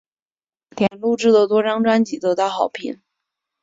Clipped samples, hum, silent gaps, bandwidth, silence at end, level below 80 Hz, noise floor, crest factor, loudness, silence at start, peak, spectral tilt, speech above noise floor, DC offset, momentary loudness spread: under 0.1%; none; none; 7.8 kHz; 0.7 s; -64 dBFS; under -90 dBFS; 16 dB; -18 LUFS; 0.75 s; -4 dBFS; -5.5 dB/octave; over 72 dB; under 0.1%; 12 LU